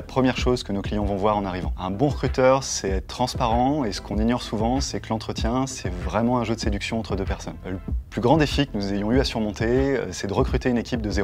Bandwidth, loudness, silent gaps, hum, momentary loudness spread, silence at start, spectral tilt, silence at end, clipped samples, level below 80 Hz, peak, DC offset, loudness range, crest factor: 15 kHz; -24 LUFS; none; none; 8 LU; 0 s; -5.5 dB/octave; 0 s; under 0.1%; -32 dBFS; -4 dBFS; under 0.1%; 3 LU; 20 dB